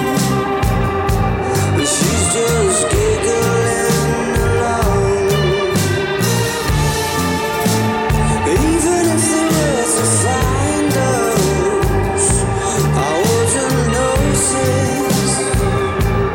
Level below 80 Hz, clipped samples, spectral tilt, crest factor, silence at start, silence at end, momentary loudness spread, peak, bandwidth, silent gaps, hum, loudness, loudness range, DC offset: -26 dBFS; under 0.1%; -4.5 dB/octave; 12 dB; 0 s; 0 s; 3 LU; -4 dBFS; 17 kHz; none; none; -15 LUFS; 1 LU; under 0.1%